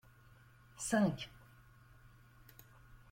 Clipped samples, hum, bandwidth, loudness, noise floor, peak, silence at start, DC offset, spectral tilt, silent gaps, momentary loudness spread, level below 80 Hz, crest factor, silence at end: under 0.1%; none; 16.5 kHz; -37 LUFS; -63 dBFS; -20 dBFS; 0.75 s; under 0.1%; -5 dB/octave; none; 27 LU; -66 dBFS; 22 dB; 0.15 s